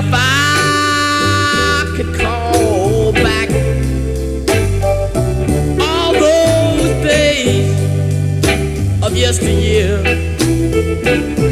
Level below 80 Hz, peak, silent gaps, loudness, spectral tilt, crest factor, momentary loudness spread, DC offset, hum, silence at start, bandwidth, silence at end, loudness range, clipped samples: -24 dBFS; 0 dBFS; none; -13 LUFS; -5 dB/octave; 12 dB; 5 LU; under 0.1%; none; 0 s; 15.5 kHz; 0 s; 2 LU; under 0.1%